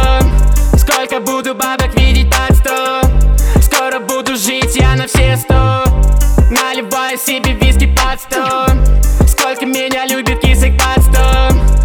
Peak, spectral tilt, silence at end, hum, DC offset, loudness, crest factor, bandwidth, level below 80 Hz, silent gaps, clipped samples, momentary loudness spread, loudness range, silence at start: 0 dBFS; -4.5 dB/octave; 0 s; none; under 0.1%; -12 LUFS; 10 dB; 19.5 kHz; -12 dBFS; none; under 0.1%; 5 LU; 1 LU; 0 s